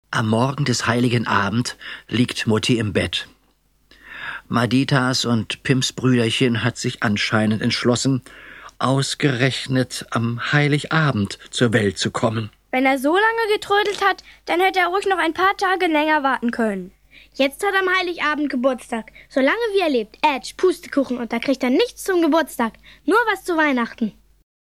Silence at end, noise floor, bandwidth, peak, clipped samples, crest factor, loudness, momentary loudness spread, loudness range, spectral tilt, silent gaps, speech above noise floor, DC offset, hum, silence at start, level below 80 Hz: 0.55 s; -61 dBFS; 15 kHz; -2 dBFS; under 0.1%; 18 dB; -20 LUFS; 8 LU; 3 LU; -5 dB/octave; none; 41 dB; under 0.1%; none; 0.1 s; -54 dBFS